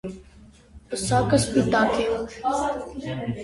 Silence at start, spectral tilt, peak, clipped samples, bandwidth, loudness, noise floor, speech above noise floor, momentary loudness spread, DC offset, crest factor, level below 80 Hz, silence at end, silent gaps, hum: 0.05 s; -5 dB/octave; -6 dBFS; under 0.1%; 11.5 kHz; -24 LUFS; -50 dBFS; 27 dB; 13 LU; under 0.1%; 18 dB; -46 dBFS; 0 s; none; none